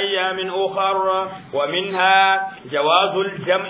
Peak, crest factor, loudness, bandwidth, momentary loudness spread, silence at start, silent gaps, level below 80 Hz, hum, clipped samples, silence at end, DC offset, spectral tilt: -2 dBFS; 16 dB; -19 LUFS; 4 kHz; 9 LU; 0 s; none; -68 dBFS; none; under 0.1%; 0 s; under 0.1%; -7.5 dB/octave